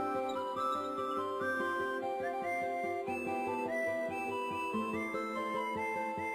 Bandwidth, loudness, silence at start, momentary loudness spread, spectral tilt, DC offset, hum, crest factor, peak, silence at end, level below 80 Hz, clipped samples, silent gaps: 15.5 kHz; -36 LUFS; 0 s; 2 LU; -5 dB/octave; under 0.1%; none; 12 dB; -24 dBFS; 0 s; -74 dBFS; under 0.1%; none